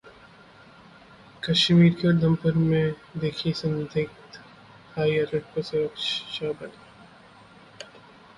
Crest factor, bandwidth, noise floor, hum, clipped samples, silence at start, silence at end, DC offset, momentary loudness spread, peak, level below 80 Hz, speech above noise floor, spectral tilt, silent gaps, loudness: 18 dB; 10.5 kHz; -51 dBFS; none; under 0.1%; 0.05 s; 0.55 s; under 0.1%; 25 LU; -8 dBFS; -58 dBFS; 27 dB; -6.5 dB/octave; none; -24 LUFS